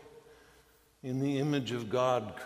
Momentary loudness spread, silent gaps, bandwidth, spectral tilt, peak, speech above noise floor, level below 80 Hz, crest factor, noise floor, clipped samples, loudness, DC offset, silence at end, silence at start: 8 LU; none; 15.5 kHz; -6.5 dB/octave; -16 dBFS; 32 dB; -70 dBFS; 18 dB; -64 dBFS; under 0.1%; -32 LUFS; under 0.1%; 0 s; 0 s